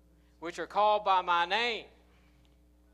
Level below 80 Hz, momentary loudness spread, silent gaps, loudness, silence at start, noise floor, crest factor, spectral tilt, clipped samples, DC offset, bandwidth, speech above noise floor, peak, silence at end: -64 dBFS; 14 LU; none; -29 LUFS; 0.4 s; -63 dBFS; 18 dB; -3 dB/octave; under 0.1%; under 0.1%; 11.5 kHz; 33 dB; -14 dBFS; 1.1 s